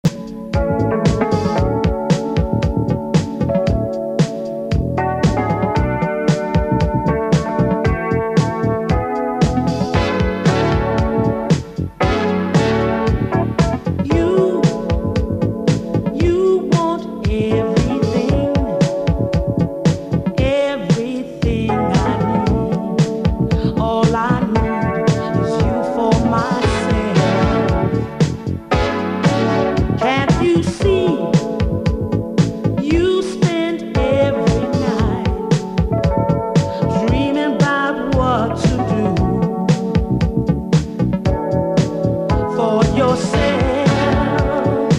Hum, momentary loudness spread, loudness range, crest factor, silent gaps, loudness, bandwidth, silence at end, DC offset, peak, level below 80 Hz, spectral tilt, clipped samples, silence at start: none; 4 LU; 1 LU; 16 dB; none; -17 LUFS; 11 kHz; 0 s; under 0.1%; 0 dBFS; -28 dBFS; -7 dB/octave; under 0.1%; 0.05 s